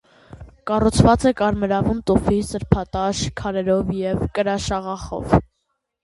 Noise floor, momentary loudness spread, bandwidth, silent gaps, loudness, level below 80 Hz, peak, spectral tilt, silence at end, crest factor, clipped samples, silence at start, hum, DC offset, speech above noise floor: -74 dBFS; 9 LU; 11.5 kHz; none; -20 LUFS; -34 dBFS; 0 dBFS; -6 dB/octave; 0.6 s; 20 dB; under 0.1%; 0.35 s; none; under 0.1%; 55 dB